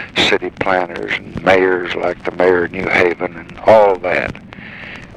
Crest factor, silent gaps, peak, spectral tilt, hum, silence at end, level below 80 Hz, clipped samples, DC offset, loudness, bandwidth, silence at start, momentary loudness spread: 16 dB; none; 0 dBFS; -5 dB/octave; none; 0 s; -44 dBFS; under 0.1%; under 0.1%; -15 LUFS; 11.5 kHz; 0 s; 16 LU